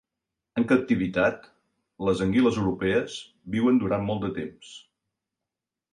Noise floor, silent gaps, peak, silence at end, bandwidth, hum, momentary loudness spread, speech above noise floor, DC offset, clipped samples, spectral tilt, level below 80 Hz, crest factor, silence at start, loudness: -88 dBFS; none; -8 dBFS; 1.15 s; 10.5 kHz; none; 16 LU; 63 dB; under 0.1%; under 0.1%; -6.5 dB/octave; -54 dBFS; 18 dB; 0.55 s; -25 LUFS